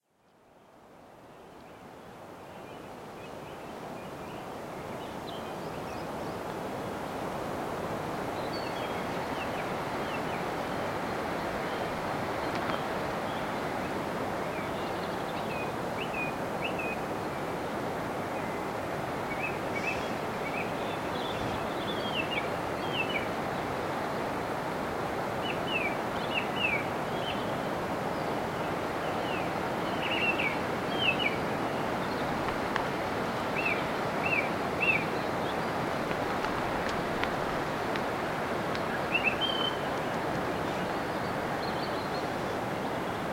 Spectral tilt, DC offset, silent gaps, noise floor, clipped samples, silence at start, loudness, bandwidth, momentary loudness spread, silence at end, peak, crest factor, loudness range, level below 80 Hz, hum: -5 dB/octave; under 0.1%; none; -64 dBFS; under 0.1%; 0.55 s; -32 LUFS; 16.5 kHz; 10 LU; 0 s; -10 dBFS; 22 dB; 8 LU; -56 dBFS; none